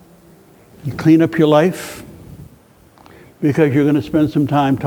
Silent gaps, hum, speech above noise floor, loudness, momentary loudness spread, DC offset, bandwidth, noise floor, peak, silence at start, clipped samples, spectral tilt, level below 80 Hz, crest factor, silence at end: none; none; 33 dB; -15 LUFS; 16 LU; under 0.1%; 19.5 kHz; -47 dBFS; 0 dBFS; 0.85 s; under 0.1%; -7.5 dB/octave; -48 dBFS; 16 dB; 0 s